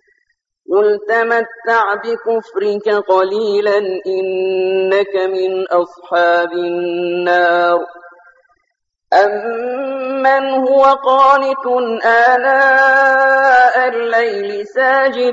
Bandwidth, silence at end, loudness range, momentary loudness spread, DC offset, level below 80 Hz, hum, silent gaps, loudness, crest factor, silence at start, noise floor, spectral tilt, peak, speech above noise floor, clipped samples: 7.8 kHz; 0 s; 6 LU; 9 LU; under 0.1%; -64 dBFS; none; none; -13 LUFS; 14 dB; 0.7 s; -70 dBFS; -4.5 dB/octave; 0 dBFS; 57 dB; under 0.1%